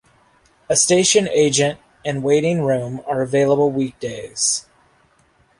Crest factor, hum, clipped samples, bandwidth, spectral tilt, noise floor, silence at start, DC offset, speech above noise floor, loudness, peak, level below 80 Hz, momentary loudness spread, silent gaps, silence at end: 18 dB; none; under 0.1%; 11.5 kHz; -3.5 dB/octave; -58 dBFS; 0.7 s; under 0.1%; 40 dB; -18 LUFS; -2 dBFS; -56 dBFS; 11 LU; none; 1 s